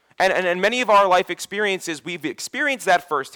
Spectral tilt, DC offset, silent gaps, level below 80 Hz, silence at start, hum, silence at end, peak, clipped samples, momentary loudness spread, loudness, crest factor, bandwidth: -3 dB/octave; under 0.1%; none; -62 dBFS; 0.2 s; none; 0.05 s; -8 dBFS; under 0.1%; 12 LU; -20 LUFS; 12 dB; over 20 kHz